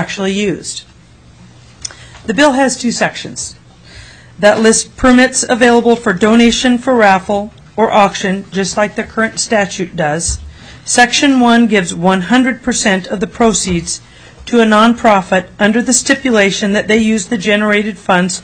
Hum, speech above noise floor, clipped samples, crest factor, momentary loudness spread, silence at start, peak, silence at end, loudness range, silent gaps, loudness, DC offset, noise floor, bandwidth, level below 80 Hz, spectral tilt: none; 30 dB; under 0.1%; 12 dB; 13 LU; 0 s; 0 dBFS; 0 s; 5 LU; none; -11 LUFS; under 0.1%; -41 dBFS; 11 kHz; -38 dBFS; -3.5 dB/octave